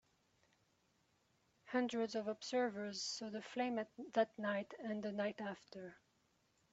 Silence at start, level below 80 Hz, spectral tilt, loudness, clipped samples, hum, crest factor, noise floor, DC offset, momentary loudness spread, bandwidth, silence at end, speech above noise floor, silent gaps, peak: 1.65 s; -86 dBFS; -3 dB/octave; -42 LUFS; under 0.1%; none; 20 dB; -79 dBFS; under 0.1%; 9 LU; 8 kHz; 0.75 s; 37 dB; none; -24 dBFS